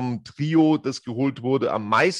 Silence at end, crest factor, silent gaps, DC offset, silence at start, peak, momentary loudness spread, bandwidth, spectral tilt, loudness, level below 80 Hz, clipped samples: 0 s; 16 dB; none; under 0.1%; 0 s; -6 dBFS; 10 LU; 10.5 kHz; -6 dB/octave; -23 LUFS; -66 dBFS; under 0.1%